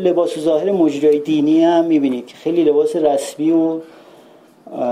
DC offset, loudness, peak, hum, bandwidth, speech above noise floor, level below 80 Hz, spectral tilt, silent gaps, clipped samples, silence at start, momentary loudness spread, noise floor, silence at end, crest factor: under 0.1%; -16 LUFS; -4 dBFS; none; 13 kHz; 31 dB; -64 dBFS; -6 dB/octave; none; under 0.1%; 0 s; 8 LU; -46 dBFS; 0 s; 12 dB